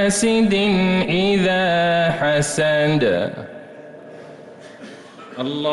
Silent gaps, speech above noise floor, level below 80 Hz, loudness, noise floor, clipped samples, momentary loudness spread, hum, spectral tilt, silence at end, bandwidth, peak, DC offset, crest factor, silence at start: none; 22 dB; -48 dBFS; -18 LUFS; -40 dBFS; under 0.1%; 22 LU; none; -4.5 dB/octave; 0 s; 12 kHz; -8 dBFS; under 0.1%; 12 dB; 0 s